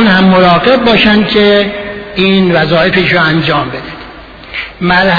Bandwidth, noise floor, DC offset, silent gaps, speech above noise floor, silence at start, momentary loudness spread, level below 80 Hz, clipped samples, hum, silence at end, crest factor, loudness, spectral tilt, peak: 5.4 kHz; -30 dBFS; under 0.1%; none; 22 dB; 0 s; 14 LU; -34 dBFS; 0.3%; none; 0 s; 8 dB; -8 LUFS; -7.5 dB/octave; 0 dBFS